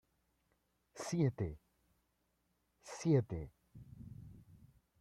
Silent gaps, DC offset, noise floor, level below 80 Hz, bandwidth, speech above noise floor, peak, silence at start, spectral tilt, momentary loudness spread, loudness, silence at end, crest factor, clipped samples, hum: none; under 0.1%; -81 dBFS; -64 dBFS; 12.5 kHz; 45 dB; -22 dBFS; 0.95 s; -7 dB/octave; 25 LU; -38 LUFS; 0.6 s; 20 dB; under 0.1%; none